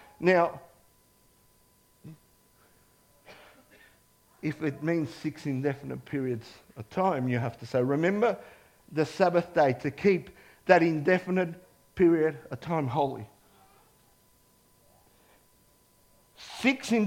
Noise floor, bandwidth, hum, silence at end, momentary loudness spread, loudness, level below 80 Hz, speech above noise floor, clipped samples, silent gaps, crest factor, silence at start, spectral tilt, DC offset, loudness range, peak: -64 dBFS; 16.5 kHz; 50 Hz at -60 dBFS; 0 s; 16 LU; -28 LUFS; -66 dBFS; 37 dB; under 0.1%; none; 24 dB; 0.2 s; -7 dB/octave; under 0.1%; 10 LU; -6 dBFS